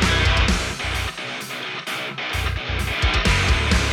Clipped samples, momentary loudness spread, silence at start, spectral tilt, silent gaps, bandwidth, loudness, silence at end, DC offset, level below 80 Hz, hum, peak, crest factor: under 0.1%; 10 LU; 0 s; -4 dB/octave; none; 16.5 kHz; -21 LUFS; 0 s; under 0.1%; -26 dBFS; none; -6 dBFS; 16 dB